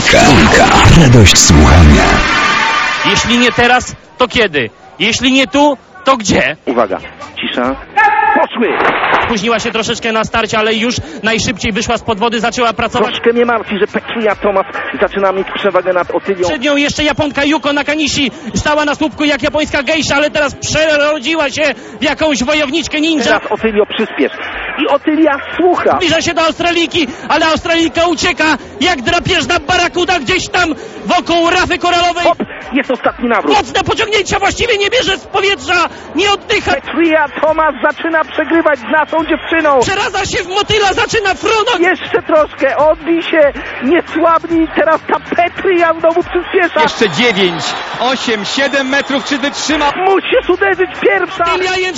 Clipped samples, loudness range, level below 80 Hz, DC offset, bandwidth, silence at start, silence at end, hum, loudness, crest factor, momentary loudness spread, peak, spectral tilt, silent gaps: 0.4%; 3 LU; -26 dBFS; under 0.1%; 16 kHz; 0 s; 0 s; none; -11 LUFS; 12 dB; 6 LU; 0 dBFS; -4 dB/octave; none